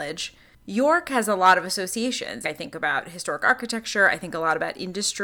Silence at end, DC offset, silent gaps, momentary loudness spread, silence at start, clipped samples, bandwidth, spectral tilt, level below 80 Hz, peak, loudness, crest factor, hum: 0 s; under 0.1%; none; 12 LU; 0 s; under 0.1%; over 20 kHz; -2.5 dB/octave; -62 dBFS; -6 dBFS; -23 LUFS; 18 dB; none